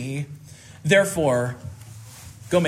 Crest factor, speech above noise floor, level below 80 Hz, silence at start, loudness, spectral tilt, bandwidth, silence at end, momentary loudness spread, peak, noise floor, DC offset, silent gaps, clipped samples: 20 dB; 20 dB; -56 dBFS; 0 s; -22 LUFS; -5 dB/octave; 16 kHz; 0 s; 23 LU; -4 dBFS; -42 dBFS; under 0.1%; none; under 0.1%